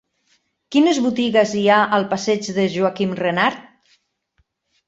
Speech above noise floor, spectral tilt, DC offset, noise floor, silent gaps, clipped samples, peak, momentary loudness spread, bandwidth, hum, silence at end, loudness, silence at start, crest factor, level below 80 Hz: 49 dB; -5 dB/octave; under 0.1%; -66 dBFS; none; under 0.1%; -2 dBFS; 6 LU; 8.2 kHz; none; 1.25 s; -18 LUFS; 0.7 s; 18 dB; -62 dBFS